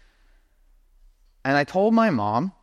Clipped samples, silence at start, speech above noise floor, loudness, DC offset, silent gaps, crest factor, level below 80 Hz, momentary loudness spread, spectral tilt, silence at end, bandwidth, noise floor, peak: under 0.1%; 1.45 s; 37 dB; -22 LUFS; under 0.1%; none; 18 dB; -58 dBFS; 6 LU; -7 dB/octave; 0.1 s; 8 kHz; -58 dBFS; -8 dBFS